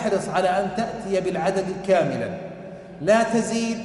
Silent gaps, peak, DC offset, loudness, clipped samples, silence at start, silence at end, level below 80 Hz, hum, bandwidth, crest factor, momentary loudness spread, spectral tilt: none; -8 dBFS; under 0.1%; -23 LUFS; under 0.1%; 0 s; 0 s; -54 dBFS; none; 11.5 kHz; 16 dB; 14 LU; -5 dB/octave